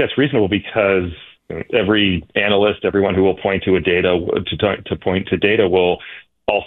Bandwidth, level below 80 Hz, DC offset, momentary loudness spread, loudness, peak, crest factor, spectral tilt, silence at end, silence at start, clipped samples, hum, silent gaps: 4.1 kHz; -44 dBFS; under 0.1%; 10 LU; -17 LUFS; -2 dBFS; 14 dB; -9.5 dB/octave; 0 s; 0 s; under 0.1%; none; none